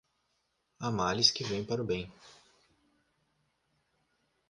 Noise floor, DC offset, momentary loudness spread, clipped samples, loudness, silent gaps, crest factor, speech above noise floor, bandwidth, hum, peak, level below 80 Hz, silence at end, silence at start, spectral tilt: -78 dBFS; under 0.1%; 13 LU; under 0.1%; -30 LUFS; none; 28 dB; 46 dB; 11 kHz; none; -8 dBFS; -62 dBFS; 2.2 s; 0.8 s; -3.5 dB/octave